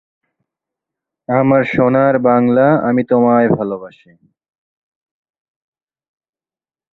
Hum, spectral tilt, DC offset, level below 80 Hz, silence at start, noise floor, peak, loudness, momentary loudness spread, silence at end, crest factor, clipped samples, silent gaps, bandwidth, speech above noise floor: none; -10.5 dB/octave; under 0.1%; -54 dBFS; 1.3 s; under -90 dBFS; 0 dBFS; -13 LUFS; 8 LU; 3.05 s; 16 dB; under 0.1%; none; 4.2 kHz; over 77 dB